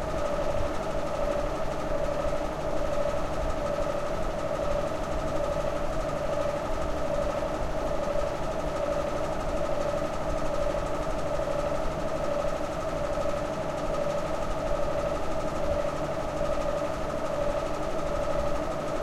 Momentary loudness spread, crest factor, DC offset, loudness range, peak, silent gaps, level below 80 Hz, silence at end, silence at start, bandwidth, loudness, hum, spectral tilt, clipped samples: 2 LU; 14 dB; under 0.1%; 0 LU; -14 dBFS; none; -36 dBFS; 0 s; 0 s; 13.5 kHz; -30 LUFS; none; -5.5 dB/octave; under 0.1%